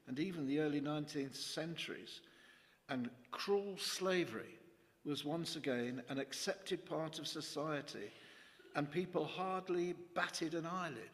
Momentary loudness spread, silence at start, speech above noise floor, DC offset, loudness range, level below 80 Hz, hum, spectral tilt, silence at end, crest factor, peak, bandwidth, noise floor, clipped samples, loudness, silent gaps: 12 LU; 0.05 s; 25 dB; under 0.1%; 2 LU; -82 dBFS; none; -4.5 dB/octave; 0 s; 20 dB; -22 dBFS; 15.5 kHz; -66 dBFS; under 0.1%; -42 LUFS; none